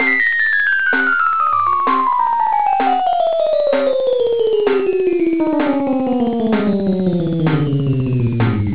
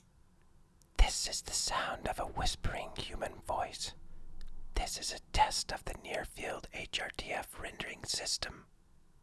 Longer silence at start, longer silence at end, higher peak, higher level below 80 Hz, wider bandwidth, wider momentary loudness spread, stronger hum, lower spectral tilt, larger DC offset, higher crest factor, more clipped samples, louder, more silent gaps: second, 0 s vs 0.95 s; second, 0 s vs 0.6 s; first, -2 dBFS vs -12 dBFS; about the same, -44 dBFS vs -42 dBFS; second, 4 kHz vs 12 kHz; second, 4 LU vs 11 LU; neither; first, -10.5 dB/octave vs -2 dB/octave; first, 2% vs under 0.1%; second, 12 dB vs 24 dB; neither; first, -16 LUFS vs -37 LUFS; neither